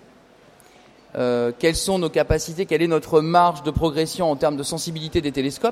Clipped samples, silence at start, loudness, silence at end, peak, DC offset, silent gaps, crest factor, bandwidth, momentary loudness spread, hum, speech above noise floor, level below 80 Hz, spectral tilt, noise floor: under 0.1%; 1.15 s; -21 LUFS; 0 s; -4 dBFS; under 0.1%; none; 18 dB; 15.5 kHz; 8 LU; none; 30 dB; -40 dBFS; -5 dB/octave; -51 dBFS